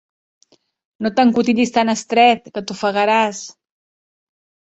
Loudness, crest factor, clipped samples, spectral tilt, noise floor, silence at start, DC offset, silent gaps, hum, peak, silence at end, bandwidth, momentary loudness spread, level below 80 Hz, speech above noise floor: -16 LUFS; 18 dB; under 0.1%; -4 dB/octave; under -90 dBFS; 1 s; under 0.1%; none; none; -2 dBFS; 1.2 s; 8.2 kHz; 12 LU; -62 dBFS; over 74 dB